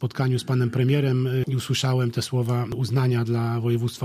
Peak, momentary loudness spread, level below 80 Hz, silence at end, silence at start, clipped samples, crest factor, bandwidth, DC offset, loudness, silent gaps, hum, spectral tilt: -8 dBFS; 4 LU; -56 dBFS; 0 s; 0 s; under 0.1%; 14 dB; 14.5 kHz; under 0.1%; -24 LUFS; none; none; -6.5 dB/octave